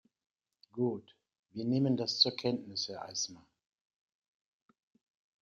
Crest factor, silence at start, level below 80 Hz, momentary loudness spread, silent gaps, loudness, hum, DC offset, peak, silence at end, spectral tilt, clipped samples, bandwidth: 26 dB; 0.75 s; -78 dBFS; 14 LU; 1.39-1.43 s; -33 LUFS; none; under 0.1%; -12 dBFS; 2.05 s; -4.5 dB/octave; under 0.1%; 7.6 kHz